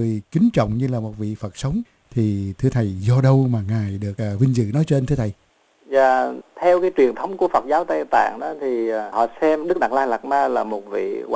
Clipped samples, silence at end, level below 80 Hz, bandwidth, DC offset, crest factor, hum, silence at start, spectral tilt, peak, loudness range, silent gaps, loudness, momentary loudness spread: under 0.1%; 0 s; -44 dBFS; 8 kHz; under 0.1%; 18 dB; none; 0 s; -8 dB/octave; -2 dBFS; 2 LU; none; -20 LUFS; 9 LU